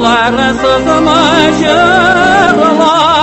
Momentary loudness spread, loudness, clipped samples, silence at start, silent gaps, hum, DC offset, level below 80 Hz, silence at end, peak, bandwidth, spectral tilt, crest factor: 3 LU; -7 LUFS; 0.4%; 0 s; none; none; under 0.1%; -32 dBFS; 0 s; 0 dBFS; 9.2 kHz; -4 dB/octave; 8 dB